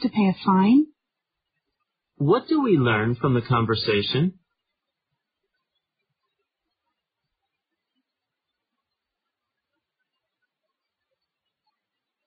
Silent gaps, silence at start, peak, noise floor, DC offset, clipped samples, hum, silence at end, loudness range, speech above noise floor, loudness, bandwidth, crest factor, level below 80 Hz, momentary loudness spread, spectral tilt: none; 0 s; -8 dBFS; -84 dBFS; under 0.1%; under 0.1%; none; 7.95 s; 7 LU; 64 dB; -21 LUFS; 5.2 kHz; 18 dB; -60 dBFS; 6 LU; -5.5 dB/octave